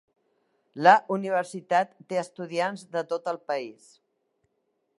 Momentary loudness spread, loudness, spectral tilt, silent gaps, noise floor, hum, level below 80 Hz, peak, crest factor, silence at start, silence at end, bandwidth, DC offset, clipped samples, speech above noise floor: 13 LU; -26 LUFS; -5 dB/octave; none; -76 dBFS; none; -84 dBFS; -4 dBFS; 24 dB; 0.75 s; 1.3 s; 11.5 kHz; under 0.1%; under 0.1%; 50 dB